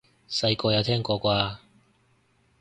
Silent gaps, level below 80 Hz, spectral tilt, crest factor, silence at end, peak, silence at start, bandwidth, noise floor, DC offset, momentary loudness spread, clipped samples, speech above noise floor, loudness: none; -54 dBFS; -5.5 dB/octave; 20 dB; 1.05 s; -8 dBFS; 0.3 s; 9.6 kHz; -65 dBFS; under 0.1%; 8 LU; under 0.1%; 40 dB; -25 LUFS